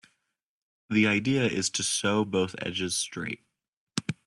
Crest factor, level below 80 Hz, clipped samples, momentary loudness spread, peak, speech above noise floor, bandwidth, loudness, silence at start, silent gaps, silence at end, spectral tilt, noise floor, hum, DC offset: 20 dB; -66 dBFS; under 0.1%; 12 LU; -8 dBFS; 40 dB; 12.5 kHz; -27 LUFS; 0.9 s; 3.68-3.87 s; 0.15 s; -3.5 dB/octave; -67 dBFS; none; under 0.1%